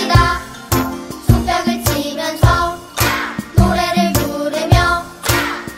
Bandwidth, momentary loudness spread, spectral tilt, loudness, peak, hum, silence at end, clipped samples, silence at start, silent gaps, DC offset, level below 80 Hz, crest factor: 16.5 kHz; 7 LU; -5 dB/octave; -16 LUFS; 0 dBFS; none; 0 s; under 0.1%; 0 s; none; under 0.1%; -24 dBFS; 16 dB